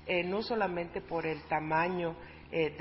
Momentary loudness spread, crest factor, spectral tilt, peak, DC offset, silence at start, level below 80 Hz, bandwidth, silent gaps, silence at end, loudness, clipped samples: 7 LU; 16 dB; -4 dB/octave; -18 dBFS; under 0.1%; 0 s; -58 dBFS; 5.6 kHz; none; 0 s; -34 LUFS; under 0.1%